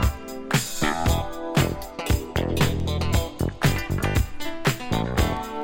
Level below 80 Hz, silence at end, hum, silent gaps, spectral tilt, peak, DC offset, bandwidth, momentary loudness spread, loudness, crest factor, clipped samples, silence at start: -32 dBFS; 0 s; none; none; -5 dB/octave; -8 dBFS; under 0.1%; 17 kHz; 4 LU; -25 LUFS; 16 dB; under 0.1%; 0 s